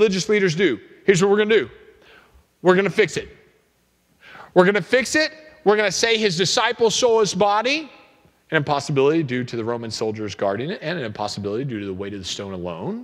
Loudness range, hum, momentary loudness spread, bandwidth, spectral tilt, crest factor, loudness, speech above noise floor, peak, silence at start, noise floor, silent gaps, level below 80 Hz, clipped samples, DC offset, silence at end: 6 LU; none; 12 LU; 13.5 kHz; -4 dB/octave; 20 dB; -20 LUFS; 43 dB; 0 dBFS; 0 s; -63 dBFS; none; -58 dBFS; under 0.1%; under 0.1%; 0 s